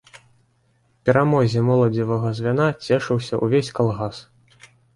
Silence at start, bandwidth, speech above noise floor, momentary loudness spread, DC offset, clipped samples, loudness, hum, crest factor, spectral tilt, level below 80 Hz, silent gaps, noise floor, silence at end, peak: 0.15 s; 11.5 kHz; 43 dB; 7 LU; under 0.1%; under 0.1%; -20 LUFS; none; 18 dB; -7.5 dB/octave; -54 dBFS; none; -63 dBFS; 0.75 s; -4 dBFS